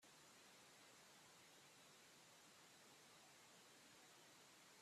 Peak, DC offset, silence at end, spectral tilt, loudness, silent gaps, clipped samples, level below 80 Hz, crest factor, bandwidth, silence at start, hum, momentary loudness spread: -54 dBFS; under 0.1%; 0 s; -1.5 dB/octave; -66 LUFS; none; under 0.1%; under -90 dBFS; 14 dB; 14.5 kHz; 0 s; none; 0 LU